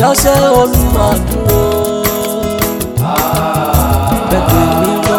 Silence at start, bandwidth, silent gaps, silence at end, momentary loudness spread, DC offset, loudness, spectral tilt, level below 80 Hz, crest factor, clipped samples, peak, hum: 0 s; 19.5 kHz; none; 0 s; 6 LU; under 0.1%; -12 LUFS; -5 dB/octave; -20 dBFS; 10 dB; under 0.1%; 0 dBFS; none